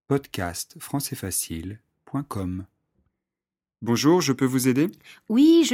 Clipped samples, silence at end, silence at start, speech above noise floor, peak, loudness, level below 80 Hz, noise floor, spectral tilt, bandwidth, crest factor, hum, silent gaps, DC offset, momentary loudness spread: under 0.1%; 0 s; 0.1 s; over 67 dB; -8 dBFS; -24 LUFS; -56 dBFS; under -90 dBFS; -5 dB/octave; 16.5 kHz; 16 dB; none; none; under 0.1%; 14 LU